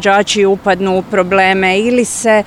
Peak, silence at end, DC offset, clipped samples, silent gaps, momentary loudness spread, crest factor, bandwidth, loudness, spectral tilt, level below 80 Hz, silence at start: 0 dBFS; 0 s; 0.1%; under 0.1%; none; 4 LU; 12 dB; 14 kHz; -12 LUFS; -4 dB/octave; -44 dBFS; 0 s